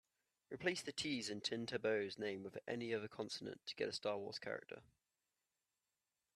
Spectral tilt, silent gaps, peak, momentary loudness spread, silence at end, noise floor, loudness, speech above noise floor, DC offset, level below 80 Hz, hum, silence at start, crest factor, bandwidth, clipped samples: -3.5 dB/octave; none; -24 dBFS; 9 LU; 1.55 s; under -90 dBFS; -44 LUFS; over 46 dB; under 0.1%; -82 dBFS; none; 0.5 s; 22 dB; 13 kHz; under 0.1%